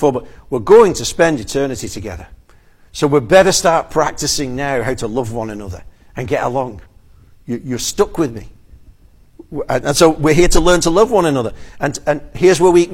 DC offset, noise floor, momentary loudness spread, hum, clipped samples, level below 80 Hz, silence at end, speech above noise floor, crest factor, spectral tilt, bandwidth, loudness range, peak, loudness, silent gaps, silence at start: under 0.1%; -46 dBFS; 17 LU; none; under 0.1%; -30 dBFS; 0 s; 32 dB; 16 dB; -4.5 dB/octave; 16.5 kHz; 8 LU; 0 dBFS; -15 LUFS; none; 0 s